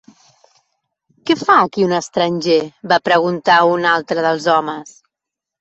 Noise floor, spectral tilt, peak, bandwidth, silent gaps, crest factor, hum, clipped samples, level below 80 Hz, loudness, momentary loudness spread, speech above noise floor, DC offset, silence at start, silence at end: -84 dBFS; -4.5 dB/octave; -2 dBFS; 8.2 kHz; none; 16 dB; none; under 0.1%; -62 dBFS; -15 LUFS; 6 LU; 69 dB; under 0.1%; 1.25 s; 0.7 s